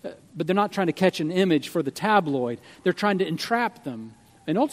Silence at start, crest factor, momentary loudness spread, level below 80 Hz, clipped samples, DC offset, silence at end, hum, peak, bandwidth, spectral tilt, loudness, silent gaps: 0.05 s; 20 dB; 14 LU; -70 dBFS; under 0.1%; under 0.1%; 0 s; none; -4 dBFS; 15.5 kHz; -6 dB/octave; -24 LUFS; none